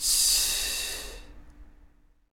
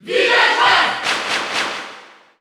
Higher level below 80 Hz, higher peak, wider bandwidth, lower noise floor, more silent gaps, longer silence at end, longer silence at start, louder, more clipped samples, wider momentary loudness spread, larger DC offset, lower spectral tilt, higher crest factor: first, -46 dBFS vs -60 dBFS; second, -10 dBFS vs -2 dBFS; second, 18 kHz vs over 20 kHz; first, -58 dBFS vs -41 dBFS; neither; first, 0.75 s vs 0.35 s; about the same, 0 s vs 0.05 s; second, -24 LUFS vs -15 LUFS; neither; first, 17 LU vs 13 LU; neither; second, 1.5 dB/octave vs -1 dB/octave; about the same, 18 dB vs 16 dB